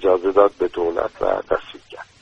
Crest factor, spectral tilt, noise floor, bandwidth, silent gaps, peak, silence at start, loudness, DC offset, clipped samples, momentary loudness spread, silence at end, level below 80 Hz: 20 dB; -6 dB/octave; -40 dBFS; 7.6 kHz; none; 0 dBFS; 0 s; -20 LUFS; under 0.1%; under 0.1%; 21 LU; 0.2 s; -48 dBFS